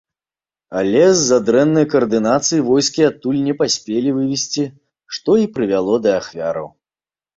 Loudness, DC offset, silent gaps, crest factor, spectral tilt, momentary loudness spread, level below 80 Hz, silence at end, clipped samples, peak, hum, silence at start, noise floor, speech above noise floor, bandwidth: -16 LUFS; under 0.1%; none; 16 dB; -4.5 dB/octave; 10 LU; -56 dBFS; 0.7 s; under 0.1%; -2 dBFS; none; 0.7 s; under -90 dBFS; over 74 dB; 7.8 kHz